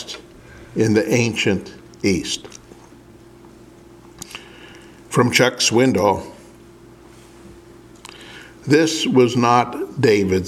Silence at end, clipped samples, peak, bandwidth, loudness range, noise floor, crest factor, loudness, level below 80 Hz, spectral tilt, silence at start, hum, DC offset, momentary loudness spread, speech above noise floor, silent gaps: 0 s; under 0.1%; 0 dBFS; 16 kHz; 8 LU; -44 dBFS; 20 dB; -18 LUFS; -52 dBFS; -4.5 dB/octave; 0 s; none; under 0.1%; 23 LU; 28 dB; none